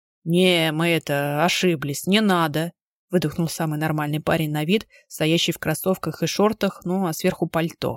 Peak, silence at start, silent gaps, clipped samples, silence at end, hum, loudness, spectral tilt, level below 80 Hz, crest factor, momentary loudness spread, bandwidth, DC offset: -4 dBFS; 0.25 s; 2.82-3.08 s; under 0.1%; 0 s; none; -22 LUFS; -5 dB/octave; -56 dBFS; 18 dB; 7 LU; 17 kHz; under 0.1%